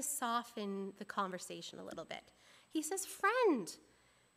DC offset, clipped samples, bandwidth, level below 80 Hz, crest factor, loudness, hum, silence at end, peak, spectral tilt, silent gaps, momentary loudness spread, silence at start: under 0.1%; under 0.1%; 15.5 kHz; -82 dBFS; 20 dB; -39 LUFS; 60 Hz at -75 dBFS; 0.55 s; -20 dBFS; -3 dB/octave; none; 16 LU; 0 s